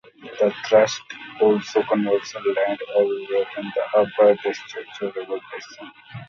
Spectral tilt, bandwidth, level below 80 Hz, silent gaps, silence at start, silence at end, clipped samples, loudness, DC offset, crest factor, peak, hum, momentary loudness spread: -4.5 dB/octave; 7.4 kHz; -70 dBFS; none; 0.2 s; 0.05 s; under 0.1%; -22 LUFS; under 0.1%; 18 dB; -4 dBFS; none; 18 LU